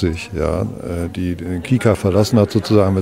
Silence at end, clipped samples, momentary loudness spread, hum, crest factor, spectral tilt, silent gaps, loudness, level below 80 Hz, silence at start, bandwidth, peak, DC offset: 0 s; under 0.1%; 9 LU; none; 16 dB; -7 dB/octave; none; -18 LUFS; -36 dBFS; 0 s; 16 kHz; 0 dBFS; 0.2%